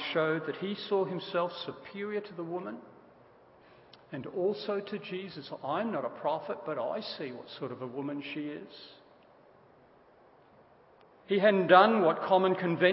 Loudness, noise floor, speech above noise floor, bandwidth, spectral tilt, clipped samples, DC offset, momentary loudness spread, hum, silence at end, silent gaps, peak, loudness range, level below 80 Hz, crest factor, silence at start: -31 LUFS; -60 dBFS; 30 dB; 5.8 kHz; -9.5 dB/octave; under 0.1%; under 0.1%; 16 LU; none; 0 s; none; -6 dBFS; 14 LU; -80 dBFS; 24 dB; 0 s